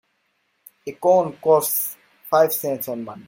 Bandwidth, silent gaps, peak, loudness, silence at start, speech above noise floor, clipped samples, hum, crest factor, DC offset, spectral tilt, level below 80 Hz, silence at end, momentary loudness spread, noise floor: 16.5 kHz; none; -4 dBFS; -20 LUFS; 0.85 s; 49 dB; under 0.1%; none; 18 dB; under 0.1%; -4.5 dB/octave; -72 dBFS; 0.05 s; 16 LU; -69 dBFS